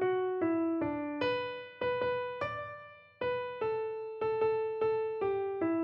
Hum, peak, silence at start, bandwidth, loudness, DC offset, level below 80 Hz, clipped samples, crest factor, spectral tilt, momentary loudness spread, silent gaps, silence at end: none; -20 dBFS; 0 s; 5.8 kHz; -34 LUFS; under 0.1%; -68 dBFS; under 0.1%; 12 dB; -8 dB/octave; 7 LU; none; 0 s